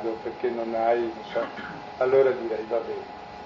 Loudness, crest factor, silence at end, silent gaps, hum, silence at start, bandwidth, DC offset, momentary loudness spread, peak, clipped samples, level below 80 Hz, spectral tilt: -26 LUFS; 18 dB; 0 s; none; none; 0 s; 7 kHz; under 0.1%; 15 LU; -10 dBFS; under 0.1%; -62 dBFS; -6.5 dB/octave